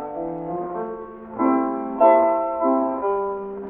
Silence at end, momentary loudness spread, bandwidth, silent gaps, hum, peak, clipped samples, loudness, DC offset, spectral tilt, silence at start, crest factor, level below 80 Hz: 0 s; 14 LU; 3.6 kHz; none; none; -2 dBFS; under 0.1%; -21 LUFS; under 0.1%; -11.5 dB/octave; 0 s; 18 dB; -56 dBFS